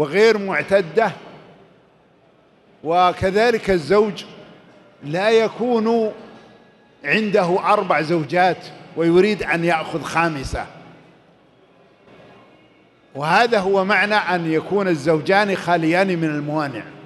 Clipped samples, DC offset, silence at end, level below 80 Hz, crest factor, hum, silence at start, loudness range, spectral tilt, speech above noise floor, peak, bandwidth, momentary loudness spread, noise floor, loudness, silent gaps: under 0.1%; under 0.1%; 0 s; -48 dBFS; 16 dB; none; 0 s; 6 LU; -6 dB/octave; 36 dB; -2 dBFS; 12 kHz; 12 LU; -54 dBFS; -18 LUFS; none